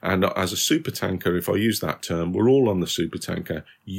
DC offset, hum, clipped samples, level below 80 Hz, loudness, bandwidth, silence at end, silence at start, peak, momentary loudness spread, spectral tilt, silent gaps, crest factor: under 0.1%; none; under 0.1%; -58 dBFS; -23 LUFS; 16.5 kHz; 0 s; 0.05 s; -6 dBFS; 10 LU; -4.5 dB/octave; none; 18 dB